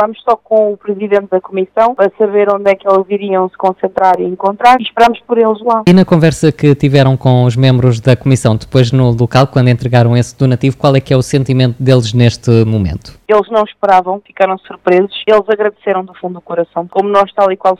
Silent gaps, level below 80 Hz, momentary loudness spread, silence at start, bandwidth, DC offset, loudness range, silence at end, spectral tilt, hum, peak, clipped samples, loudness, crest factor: none; -40 dBFS; 7 LU; 0 s; 11 kHz; under 0.1%; 3 LU; 0 s; -7 dB/octave; none; 0 dBFS; 2%; -11 LUFS; 10 dB